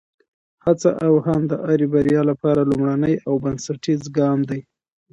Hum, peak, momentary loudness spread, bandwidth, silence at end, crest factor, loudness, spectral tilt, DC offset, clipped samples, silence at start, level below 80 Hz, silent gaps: none; -4 dBFS; 8 LU; 8.2 kHz; 0.5 s; 16 dB; -19 LUFS; -7.5 dB/octave; under 0.1%; under 0.1%; 0.65 s; -52 dBFS; none